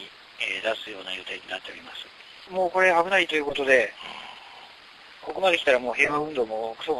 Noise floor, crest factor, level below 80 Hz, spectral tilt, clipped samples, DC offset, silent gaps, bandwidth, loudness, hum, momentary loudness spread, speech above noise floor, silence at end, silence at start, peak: -48 dBFS; 20 dB; -62 dBFS; -3 dB/octave; under 0.1%; under 0.1%; none; 12 kHz; -24 LUFS; none; 21 LU; 23 dB; 0 s; 0 s; -6 dBFS